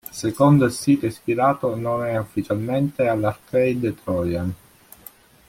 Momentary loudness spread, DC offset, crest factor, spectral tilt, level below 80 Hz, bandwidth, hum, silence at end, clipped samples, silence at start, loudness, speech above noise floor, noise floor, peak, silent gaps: 9 LU; under 0.1%; 18 dB; -7 dB/octave; -54 dBFS; 16.5 kHz; none; 0.95 s; under 0.1%; 0.15 s; -21 LUFS; 27 dB; -47 dBFS; -4 dBFS; none